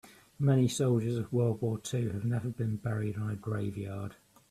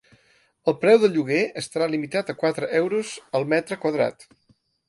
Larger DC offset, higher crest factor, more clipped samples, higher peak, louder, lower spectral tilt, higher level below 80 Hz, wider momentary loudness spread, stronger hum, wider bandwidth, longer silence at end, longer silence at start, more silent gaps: neither; about the same, 16 dB vs 20 dB; neither; second, -16 dBFS vs -4 dBFS; second, -32 LUFS vs -23 LUFS; first, -7 dB/octave vs -5.5 dB/octave; first, -64 dBFS vs -70 dBFS; about the same, 10 LU vs 10 LU; neither; first, 14 kHz vs 11.5 kHz; second, 0.4 s vs 0.75 s; second, 0.05 s vs 0.65 s; neither